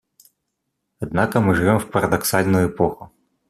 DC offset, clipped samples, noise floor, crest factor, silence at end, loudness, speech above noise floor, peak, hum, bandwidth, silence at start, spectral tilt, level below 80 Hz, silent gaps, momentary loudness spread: under 0.1%; under 0.1%; -76 dBFS; 18 dB; 0.45 s; -19 LUFS; 58 dB; -2 dBFS; none; 14.5 kHz; 1 s; -6 dB/octave; -48 dBFS; none; 8 LU